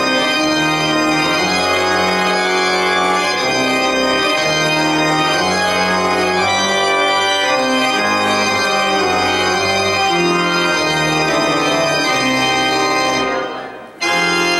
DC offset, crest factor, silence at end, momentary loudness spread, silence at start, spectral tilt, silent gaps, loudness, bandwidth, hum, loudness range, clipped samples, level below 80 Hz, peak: under 0.1%; 12 dB; 0 s; 1 LU; 0 s; -3 dB/octave; none; -14 LUFS; 16 kHz; none; 0 LU; under 0.1%; -48 dBFS; -4 dBFS